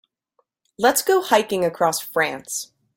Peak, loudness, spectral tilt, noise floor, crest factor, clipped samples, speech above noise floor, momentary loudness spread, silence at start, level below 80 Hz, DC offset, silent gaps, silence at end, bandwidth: -2 dBFS; -20 LUFS; -2.5 dB/octave; -69 dBFS; 20 dB; under 0.1%; 49 dB; 11 LU; 0.8 s; -64 dBFS; under 0.1%; none; 0.3 s; 17 kHz